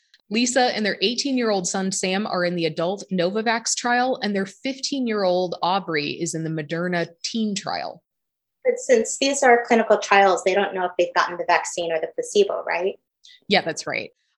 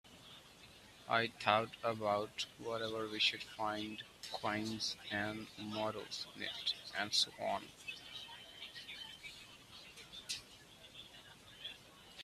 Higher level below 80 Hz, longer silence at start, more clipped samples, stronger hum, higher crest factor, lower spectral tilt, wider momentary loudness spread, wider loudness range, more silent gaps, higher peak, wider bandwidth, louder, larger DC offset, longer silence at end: about the same, -74 dBFS vs -74 dBFS; first, 0.3 s vs 0.05 s; neither; neither; second, 20 dB vs 30 dB; about the same, -3.5 dB/octave vs -3 dB/octave; second, 9 LU vs 21 LU; second, 5 LU vs 12 LU; neither; first, -2 dBFS vs -12 dBFS; second, 12 kHz vs 15 kHz; first, -22 LUFS vs -40 LUFS; neither; first, 0.3 s vs 0 s